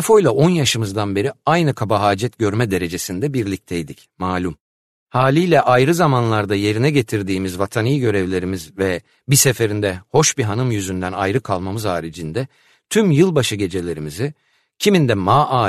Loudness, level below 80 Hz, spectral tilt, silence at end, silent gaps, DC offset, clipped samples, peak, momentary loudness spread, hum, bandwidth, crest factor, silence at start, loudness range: -18 LUFS; -50 dBFS; -5 dB/octave; 0 s; 4.61-5.07 s; under 0.1%; under 0.1%; -2 dBFS; 11 LU; none; 13.5 kHz; 16 dB; 0 s; 3 LU